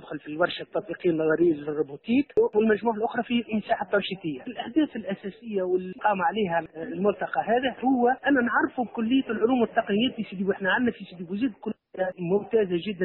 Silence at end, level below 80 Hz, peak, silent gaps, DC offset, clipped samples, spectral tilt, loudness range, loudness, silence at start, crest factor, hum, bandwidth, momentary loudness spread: 0 s; -64 dBFS; -8 dBFS; none; under 0.1%; under 0.1%; -4 dB/octave; 3 LU; -26 LUFS; 0 s; 18 dB; none; 4.2 kHz; 10 LU